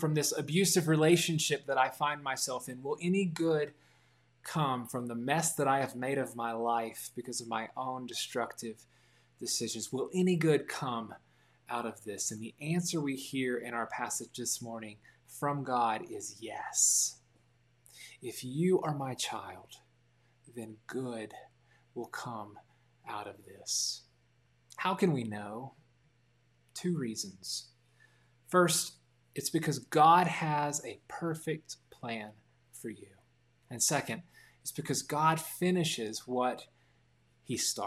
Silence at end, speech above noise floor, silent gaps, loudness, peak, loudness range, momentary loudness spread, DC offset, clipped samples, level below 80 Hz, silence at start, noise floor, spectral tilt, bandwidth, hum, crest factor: 0 s; 37 dB; none; -33 LUFS; -12 dBFS; 10 LU; 18 LU; under 0.1%; under 0.1%; -78 dBFS; 0 s; -70 dBFS; -4 dB/octave; 16 kHz; none; 22 dB